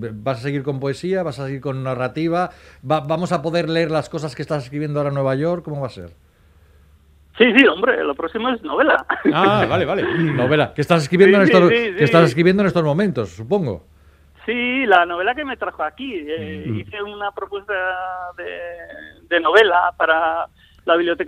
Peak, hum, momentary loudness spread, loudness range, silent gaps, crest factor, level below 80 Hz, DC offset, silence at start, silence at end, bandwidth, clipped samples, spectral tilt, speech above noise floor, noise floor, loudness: 0 dBFS; none; 15 LU; 10 LU; none; 18 dB; -52 dBFS; under 0.1%; 0 s; 0 s; 14 kHz; under 0.1%; -6.5 dB/octave; 34 dB; -52 dBFS; -18 LUFS